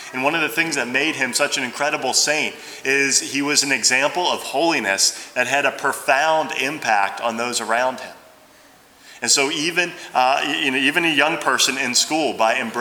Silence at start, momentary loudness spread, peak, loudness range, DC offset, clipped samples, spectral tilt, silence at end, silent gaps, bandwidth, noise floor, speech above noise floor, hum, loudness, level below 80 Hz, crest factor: 0 s; 6 LU; 0 dBFS; 4 LU; under 0.1%; under 0.1%; -1 dB/octave; 0 s; none; over 20 kHz; -49 dBFS; 30 dB; none; -18 LUFS; -70 dBFS; 20 dB